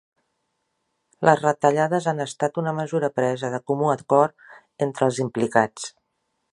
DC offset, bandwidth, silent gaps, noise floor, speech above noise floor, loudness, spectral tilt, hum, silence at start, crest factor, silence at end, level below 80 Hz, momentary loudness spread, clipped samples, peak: under 0.1%; 11.5 kHz; none; -75 dBFS; 53 dB; -22 LUFS; -6 dB/octave; none; 1.2 s; 22 dB; 0.65 s; -68 dBFS; 8 LU; under 0.1%; 0 dBFS